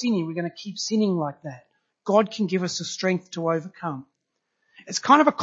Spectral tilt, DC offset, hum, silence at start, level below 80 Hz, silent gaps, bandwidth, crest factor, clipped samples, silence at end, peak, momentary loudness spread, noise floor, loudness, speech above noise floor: -5 dB/octave; under 0.1%; none; 0 s; -76 dBFS; none; 8 kHz; 22 dB; under 0.1%; 0 s; -2 dBFS; 14 LU; -78 dBFS; -24 LUFS; 54 dB